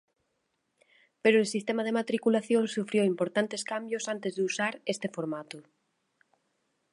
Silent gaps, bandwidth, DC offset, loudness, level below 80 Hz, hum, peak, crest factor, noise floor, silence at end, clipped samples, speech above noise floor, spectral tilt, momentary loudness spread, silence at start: none; 11.5 kHz; under 0.1%; -29 LUFS; -82 dBFS; none; -8 dBFS; 22 dB; -78 dBFS; 1.3 s; under 0.1%; 49 dB; -4.5 dB/octave; 10 LU; 1.25 s